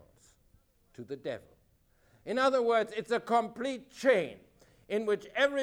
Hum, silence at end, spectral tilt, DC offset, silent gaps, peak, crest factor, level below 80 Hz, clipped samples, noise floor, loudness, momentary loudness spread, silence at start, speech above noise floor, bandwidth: none; 0 s; -4.5 dB/octave; under 0.1%; none; -14 dBFS; 20 dB; -70 dBFS; under 0.1%; -67 dBFS; -31 LUFS; 14 LU; 1 s; 37 dB; 13 kHz